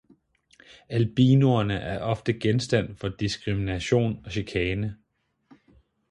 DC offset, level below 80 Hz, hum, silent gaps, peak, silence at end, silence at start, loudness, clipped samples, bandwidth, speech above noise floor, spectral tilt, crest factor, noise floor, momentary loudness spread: under 0.1%; -48 dBFS; none; none; -8 dBFS; 1.15 s; 0.9 s; -25 LUFS; under 0.1%; 11 kHz; 37 dB; -7 dB/octave; 18 dB; -61 dBFS; 11 LU